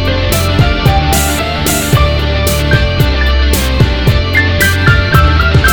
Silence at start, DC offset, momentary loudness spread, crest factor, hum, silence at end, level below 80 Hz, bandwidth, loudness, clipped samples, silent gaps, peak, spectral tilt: 0 s; 0.9%; 4 LU; 10 dB; none; 0 s; -14 dBFS; over 20 kHz; -10 LUFS; 0.3%; none; 0 dBFS; -4.5 dB/octave